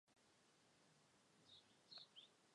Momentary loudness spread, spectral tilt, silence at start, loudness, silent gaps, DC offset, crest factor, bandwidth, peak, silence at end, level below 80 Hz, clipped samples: 8 LU; -2 dB/octave; 0.05 s; -64 LUFS; none; under 0.1%; 22 dB; 10.5 kHz; -48 dBFS; 0 s; under -90 dBFS; under 0.1%